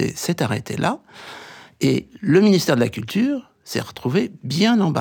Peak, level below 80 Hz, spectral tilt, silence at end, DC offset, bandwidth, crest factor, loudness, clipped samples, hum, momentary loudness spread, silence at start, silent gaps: -4 dBFS; -58 dBFS; -5.5 dB/octave; 0 s; under 0.1%; 20 kHz; 16 dB; -20 LUFS; under 0.1%; none; 15 LU; 0 s; none